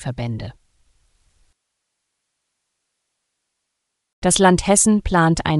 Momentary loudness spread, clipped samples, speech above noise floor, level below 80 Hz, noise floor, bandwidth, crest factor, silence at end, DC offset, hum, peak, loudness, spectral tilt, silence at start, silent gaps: 15 LU; under 0.1%; 61 dB; -38 dBFS; -78 dBFS; 13.5 kHz; 20 dB; 0 s; under 0.1%; none; 0 dBFS; -16 LUFS; -4.5 dB/octave; 0 s; 4.13-4.22 s